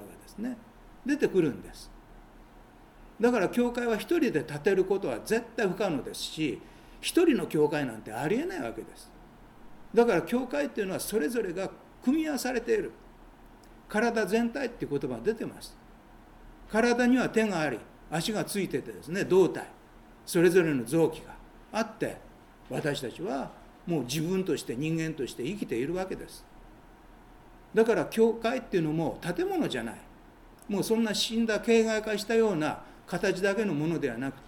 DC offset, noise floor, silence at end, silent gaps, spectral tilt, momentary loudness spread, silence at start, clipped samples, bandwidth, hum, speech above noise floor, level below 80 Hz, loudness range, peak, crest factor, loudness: under 0.1%; -53 dBFS; 0 s; none; -5 dB/octave; 14 LU; 0 s; under 0.1%; 18 kHz; none; 25 dB; -56 dBFS; 5 LU; -10 dBFS; 20 dB; -29 LUFS